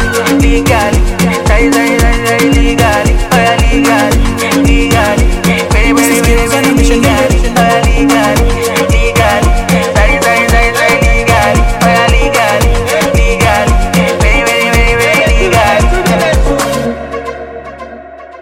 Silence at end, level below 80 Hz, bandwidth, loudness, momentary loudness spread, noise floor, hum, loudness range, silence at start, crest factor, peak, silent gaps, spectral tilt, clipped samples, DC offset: 0 s; -14 dBFS; 16.5 kHz; -9 LUFS; 3 LU; -28 dBFS; none; 1 LU; 0 s; 8 dB; 0 dBFS; none; -5 dB/octave; under 0.1%; under 0.1%